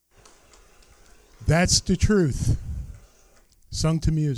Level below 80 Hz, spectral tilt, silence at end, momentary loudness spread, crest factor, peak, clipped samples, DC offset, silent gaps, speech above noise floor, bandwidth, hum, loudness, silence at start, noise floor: -34 dBFS; -4.5 dB/octave; 0 s; 17 LU; 20 dB; -4 dBFS; under 0.1%; under 0.1%; none; 35 dB; 13.5 kHz; none; -23 LUFS; 1.4 s; -56 dBFS